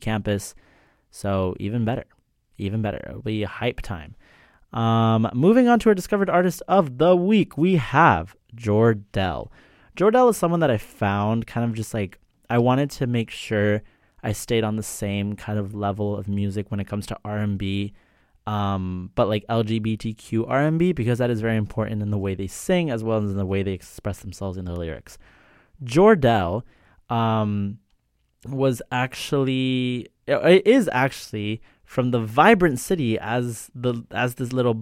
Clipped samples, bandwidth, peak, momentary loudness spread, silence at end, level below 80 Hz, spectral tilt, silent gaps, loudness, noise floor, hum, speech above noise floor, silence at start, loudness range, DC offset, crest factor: under 0.1%; 16 kHz; -2 dBFS; 14 LU; 0 s; -48 dBFS; -6.5 dB/octave; none; -22 LUFS; -67 dBFS; none; 45 dB; 0 s; 8 LU; under 0.1%; 20 dB